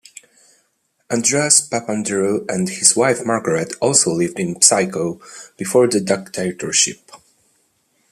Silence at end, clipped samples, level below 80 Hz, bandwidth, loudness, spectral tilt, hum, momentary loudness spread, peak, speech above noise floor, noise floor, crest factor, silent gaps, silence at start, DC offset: 0.95 s; under 0.1%; -62 dBFS; 15 kHz; -16 LUFS; -2.5 dB/octave; none; 12 LU; 0 dBFS; 48 dB; -66 dBFS; 20 dB; none; 1.1 s; under 0.1%